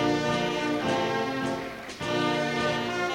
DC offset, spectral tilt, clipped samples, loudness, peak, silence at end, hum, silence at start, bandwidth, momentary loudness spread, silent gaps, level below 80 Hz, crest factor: under 0.1%; -4.5 dB/octave; under 0.1%; -28 LUFS; -14 dBFS; 0 s; none; 0 s; 16.5 kHz; 6 LU; none; -56 dBFS; 12 dB